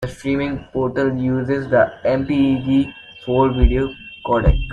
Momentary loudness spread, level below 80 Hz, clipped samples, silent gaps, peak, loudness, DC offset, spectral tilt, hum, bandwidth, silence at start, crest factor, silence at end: 7 LU; -26 dBFS; under 0.1%; none; -2 dBFS; -19 LUFS; under 0.1%; -8 dB/octave; none; 9.6 kHz; 0 s; 16 dB; 0 s